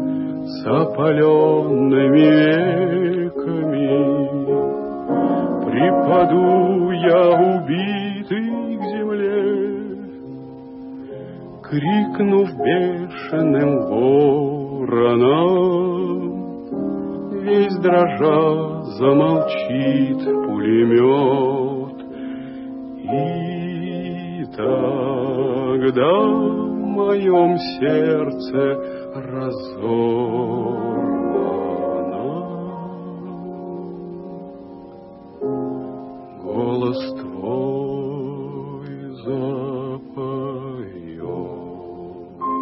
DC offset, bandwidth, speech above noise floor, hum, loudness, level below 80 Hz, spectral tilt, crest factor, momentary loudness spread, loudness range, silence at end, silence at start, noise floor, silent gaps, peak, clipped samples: under 0.1%; 5.8 kHz; 23 dB; none; -19 LUFS; -58 dBFS; -12 dB/octave; 16 dB; 17 LU; 11 LU; 0 s; 0 s; -39 dBFS; none; -2 dBFS; under 0.1%